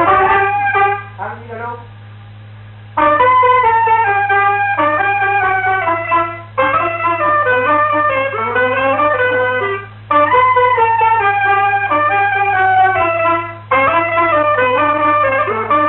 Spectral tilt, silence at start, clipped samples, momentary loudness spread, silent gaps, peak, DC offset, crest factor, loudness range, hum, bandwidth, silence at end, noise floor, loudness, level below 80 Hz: -9.5 dB/octave; 0 s; under 0.1%; 7 LU; none; -2 dBFS; 0.1%; 12 dB; 2 LU; none; 4.2 kHz; 0 s; -34 dBFS; -13 LUFS; -46 dBFS